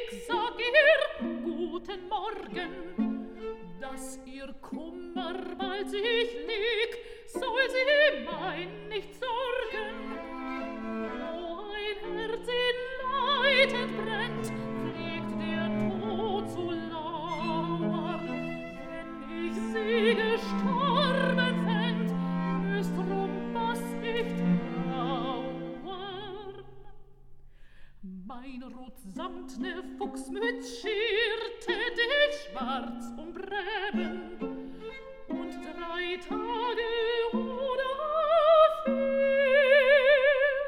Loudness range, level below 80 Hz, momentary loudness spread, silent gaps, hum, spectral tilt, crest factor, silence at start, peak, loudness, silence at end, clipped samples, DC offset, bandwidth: 10 LU; -54 dBFS; 17 LU; none; none; -5.5 dB/octave; 22 dB; 0 s; -8 dBFS; -29 LUFS; 0 s; under 0.1%; under 0.1%; 14.5 kHz